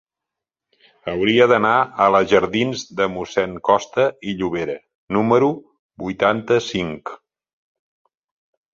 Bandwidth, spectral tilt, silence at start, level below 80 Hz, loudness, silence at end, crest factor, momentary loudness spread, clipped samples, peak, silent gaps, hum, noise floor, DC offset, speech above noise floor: 7.6 kHz; -5.5 dB/octave; 1.05 s; -54 dBFS; -19 LUFS; 1.6 s; 18 dB; 15 LU; under 0.1%; -2 dBFS; 4.95-5.07 s, 5.79-5.89 s; none; -85 dBFS; under 0.1%; 67 dB